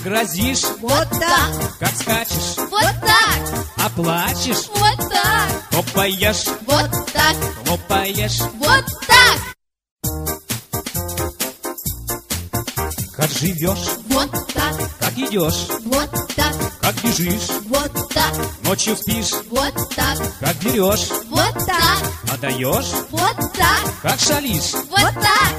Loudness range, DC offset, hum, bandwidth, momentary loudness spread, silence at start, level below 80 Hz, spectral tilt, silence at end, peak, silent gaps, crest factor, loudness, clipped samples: 5 LU; under 0.1%; none; 15.5 kHz; 9 LU; 0 s; -34 dBFS; -3 dB/octave; 0 s; 0 dBFS; 9.91-9.96 s; 18 dB; -18 LUFS; under 0.1%